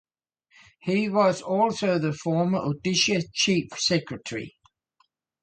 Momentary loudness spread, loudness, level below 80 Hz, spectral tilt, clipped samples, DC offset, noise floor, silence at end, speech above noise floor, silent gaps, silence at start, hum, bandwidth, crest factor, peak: 12 LU; -24 LUFS; -62 dBFS; -4.5 dB/octave; under 0.1%; under 0.1%; -70 dBFS; 0.95 s; 45 dB; none; 0.85 s; none; 9.2 kHz; 18 dB; -8 dBFS